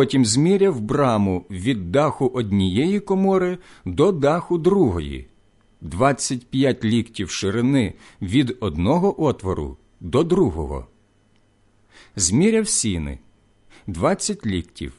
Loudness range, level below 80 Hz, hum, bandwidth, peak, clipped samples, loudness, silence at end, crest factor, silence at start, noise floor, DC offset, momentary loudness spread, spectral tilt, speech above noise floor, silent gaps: 3 LU; -40 dBFS; none; 11.5 kHz; -4 dBFS; under 0.1%; -20 LUFS; 0.05 s; 16 dB; 0 s; -59 dBFS; under 0.1%; 14 LU; -5.5 dB/octave; 39 dB; none